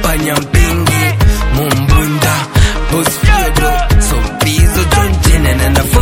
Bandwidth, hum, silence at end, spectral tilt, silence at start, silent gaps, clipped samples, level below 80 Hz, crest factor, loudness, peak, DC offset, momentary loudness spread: 17 kHz; none; 0 s; -4.5 dB/octave; 0 s; none; under 0.1%; -14 dBFS; 10 dB; -11 LUFS; 0 dBFS; under 0.1%; 3 LU